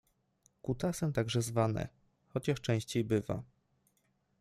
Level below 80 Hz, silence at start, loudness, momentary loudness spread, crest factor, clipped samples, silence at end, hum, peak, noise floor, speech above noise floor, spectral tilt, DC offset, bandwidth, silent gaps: -60 dBFS; 0.65 s; -35 LUFS; 9 LU; 20 dB; under 0.1%; 0.95 s; none; -16 dBFS; -76 dBFS; 43 dB; -6 dB/octave; under 0.1%; 15 kHz; none